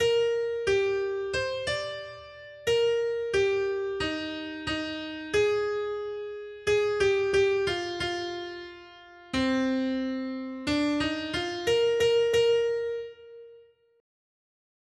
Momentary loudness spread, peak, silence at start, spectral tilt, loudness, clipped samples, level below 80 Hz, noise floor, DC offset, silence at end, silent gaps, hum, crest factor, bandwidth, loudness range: 13 LU; -14 dBFS; 0 s; -4 dB/octave; -28 LUFS; under 0.1%; -56 dBFS; -56 dBFS; under 0.1%; 1.4 s; none; none; 14 dB; 12.5 kHz; 3 LU